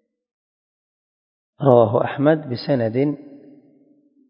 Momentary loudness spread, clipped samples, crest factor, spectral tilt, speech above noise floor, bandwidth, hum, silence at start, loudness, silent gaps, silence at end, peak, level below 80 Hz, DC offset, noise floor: 8 LU; under 0.1%; 22 dB; -11 dB/octave; 39 dB; 5.4 kHz; none; 1.6 s; -19 LUFS; none; 0.9 s; 0 dBFS; -64 dBFS; under 0.1%; -56 dBFS